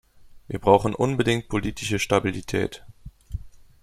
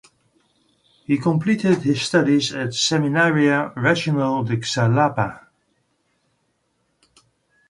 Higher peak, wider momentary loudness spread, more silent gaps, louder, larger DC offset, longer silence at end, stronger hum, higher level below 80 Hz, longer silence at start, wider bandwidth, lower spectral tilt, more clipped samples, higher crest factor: about the same, -2 dBFS vs -2 dBFS; first, 20 LU vs 6 LU; neither; second, -23 LUFS vs -19 LUFS; neither; second, 0.35 s vs 2.3 s; neither; first, -44 dBFS vs -58 dBFS; second, 0.25 s vs 1.1 s; first, 15.5 kHz vs 11.5 kHz; about the same, -5.5 dB/octave vs -5 dB/octave; neither; about the same, 22 dB vs 20 dB